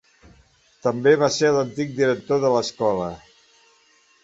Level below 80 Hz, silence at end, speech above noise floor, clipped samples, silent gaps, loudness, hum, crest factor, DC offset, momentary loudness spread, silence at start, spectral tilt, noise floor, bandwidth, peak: -58 dBFS; 1.05 s; 38 dB; under 0.1%; none; -21 LUFS; none; 18 dB; under 0.1%; 10 LU; 0.85 s; -5 dB/octave; -58 dBFS; 7.8 kHz; -4 dBFS